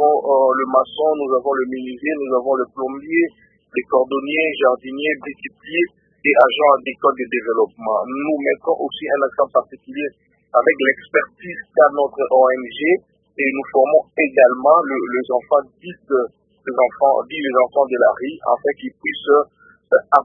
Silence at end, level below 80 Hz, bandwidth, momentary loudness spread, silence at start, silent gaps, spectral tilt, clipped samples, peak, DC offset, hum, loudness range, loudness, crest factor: 0 s; -64 dBFS; 3.8 kHz; 11 LU; 0 s; none; -7 dB/octave; under 0.1%; 0 dBFS; under 0.1%; none; 4 LU; -18 LUFS; 18 dB